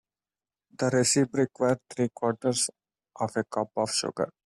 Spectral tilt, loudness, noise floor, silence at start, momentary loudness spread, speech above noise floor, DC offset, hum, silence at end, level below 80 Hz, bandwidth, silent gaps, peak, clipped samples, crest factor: -4 dB/octave; -27 LUFS; under -90 dBFS; 0.8 s; 8 LU; over 63 dB; under 0.1%; none; 0.15 s; -68 dBFS; 14.5 kHz; none; -12 dBFS; under 0.1%; 18 dB